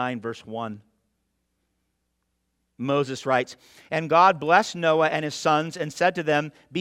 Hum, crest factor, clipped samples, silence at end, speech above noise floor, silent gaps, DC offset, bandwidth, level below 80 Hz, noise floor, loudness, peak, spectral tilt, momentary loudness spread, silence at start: none; 22 dB; under 0.1%; 0 s; 52 dB; none; under 0.1%; 15 kHz; -70 dBFS; -75 dBFS; -23 LUFS; -4 dBFS; -5 dB/octave; 15 LU; 0 s